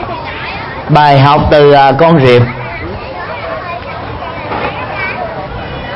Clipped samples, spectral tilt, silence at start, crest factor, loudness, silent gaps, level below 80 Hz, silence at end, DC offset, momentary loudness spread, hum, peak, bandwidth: 0.4%; -8 dB/octave; 0 s; 10 dB; -10 LUFS; none; -30 dBFS; 0 s; under 0.1%; 16 LU; none; 0 dBFS; 7.2 kHz